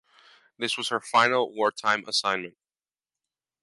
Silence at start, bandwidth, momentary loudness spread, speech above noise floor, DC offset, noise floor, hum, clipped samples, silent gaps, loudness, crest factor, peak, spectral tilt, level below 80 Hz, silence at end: 0.6 s; 11.5 kHz; 10 LU; over 64 dB; under 0.1%; under -90 dBFS; none; under 0.1%; none; -25 LUFS; 22 dB; -6 dBFS; -2 dB/octave; -76 dBFS; 1.15 s